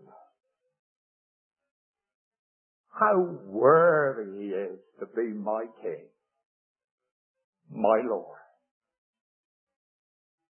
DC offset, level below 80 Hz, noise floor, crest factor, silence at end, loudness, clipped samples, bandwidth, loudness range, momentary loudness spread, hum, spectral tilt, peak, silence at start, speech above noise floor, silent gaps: under 0.1%; -86 dBFS; under -90 dBFS; 22 dB; 2.15 s; -26 LUFS; under 0.1%; 3.2 kHz; 10 LU; 19 LU; none; -11 dB/octave; -8 dBFS; 2.95 s; over 64 dB; 6.45-6.75 s, 6.84-6.98 s, 7.11-7.35 s, 7.44-7.53 s